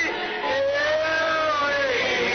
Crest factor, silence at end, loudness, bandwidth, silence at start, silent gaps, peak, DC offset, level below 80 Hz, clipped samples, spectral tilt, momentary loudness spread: 10 dB; 0 s; -22 LUFS; 6.6 kHz; 0 s; none; -12 dBFS; under 0.1%; -56 dBFS; under 0.1%; -2.5 dB/octave; 3 LU